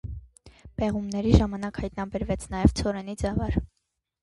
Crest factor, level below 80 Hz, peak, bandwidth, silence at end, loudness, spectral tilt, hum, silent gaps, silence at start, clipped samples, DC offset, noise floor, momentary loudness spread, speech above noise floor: 24 dB; -34 dBFS; -2 dBFS; 11.5 kHz; 0.55 s; -27 LUFS; -7 dB/octave; none; none; 0.05 s; under 0.1%; under 0.1%; -79 dBFS; 16 LU; 53 dB